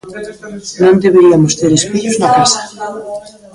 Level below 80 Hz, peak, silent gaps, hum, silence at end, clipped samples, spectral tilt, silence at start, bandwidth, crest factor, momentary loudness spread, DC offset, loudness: -46 dBFS; 0 dBFS; none; none; 0.25 s; under 0.1%; -4.5 dB/octave; 0.05 s; 11.5 kHz; 12 dB; 20 LU; under 0.1%; -10 LUFS